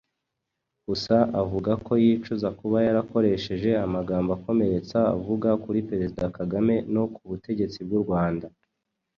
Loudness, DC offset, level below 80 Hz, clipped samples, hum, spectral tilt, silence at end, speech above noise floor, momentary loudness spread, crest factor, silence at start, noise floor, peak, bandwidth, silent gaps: -25 LUFS; under 0.1%; -50 dBFS; under 0.1%; none; -8 dB/octave; 0.7 s; 58 dB; 8 LU; 18 dB; 0.9 s; -82 dBFS; -6 dBFS; 7 kHz; none